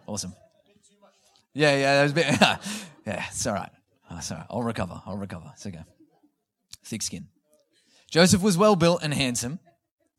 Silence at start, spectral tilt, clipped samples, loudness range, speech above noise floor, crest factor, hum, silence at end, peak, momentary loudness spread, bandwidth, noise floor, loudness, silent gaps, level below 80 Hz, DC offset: 0.1 s; -4 dB/octave; under 0.1%; 12 LU; 44 dB; 26 dB; none; 0.6 s; -2 dBFS; 21 LU; 16 kHz; -68 dBFS; -24 LUFS; none; -56 dBFS; under 0.1%